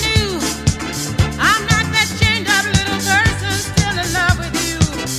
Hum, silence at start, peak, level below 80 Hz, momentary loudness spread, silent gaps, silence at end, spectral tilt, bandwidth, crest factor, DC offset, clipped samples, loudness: none; 0 s; 0 dBFS; -28 dBFS; 6 LU; none; 0 s; -3.5 dB/octave; 16 kHz; 16 dB; under 0.1%; under 0.1%; -16 LUFS